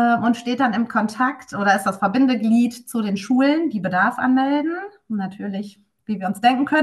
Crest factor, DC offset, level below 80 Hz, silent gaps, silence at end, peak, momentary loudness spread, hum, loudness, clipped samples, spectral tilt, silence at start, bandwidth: 14 dB; under 0.1%; -66 dBFS; none; 0 s; -4 dBFS; 11 LU; none; -20 LUFS; under 0.1%; -5.5 dB/octave; 0 s; 12.5 kHz